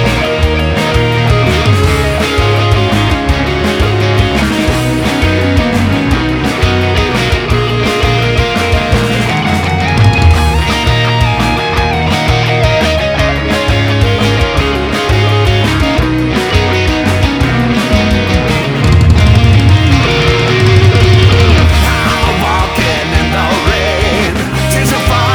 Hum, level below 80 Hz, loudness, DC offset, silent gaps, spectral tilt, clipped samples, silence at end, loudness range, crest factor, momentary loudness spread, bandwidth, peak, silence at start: none; -18 dBFS; -10 LUFS; under 0.1%; none; -5.5 dB/octave; 0.3%; 0 s; 3 LU; 10 dB; 5 LU; 19 kHz; 0 dBFS; 0 s